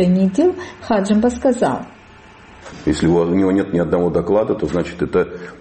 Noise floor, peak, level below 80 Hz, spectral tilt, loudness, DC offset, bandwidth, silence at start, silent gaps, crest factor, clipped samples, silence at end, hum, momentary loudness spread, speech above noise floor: -43 dBFS; -4 dBFS; -42 dBFS; -7 dB/octave; -17 LUFS; under 0.1%; 8.8 kHz; 0 s; none; 14 dB; under 0.1%; 0.05 s; none; 10 LU; 26 dB